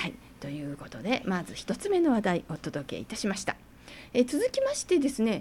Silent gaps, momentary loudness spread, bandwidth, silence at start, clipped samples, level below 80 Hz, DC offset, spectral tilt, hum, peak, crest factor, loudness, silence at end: none; 14 LU; 16.5 kHz; 0 s; under 0.1%; -56 dBFS; under 0.1%; -5 dB/octave; none; -12 dBFS; 18 dB; -30 LUFS; 0 s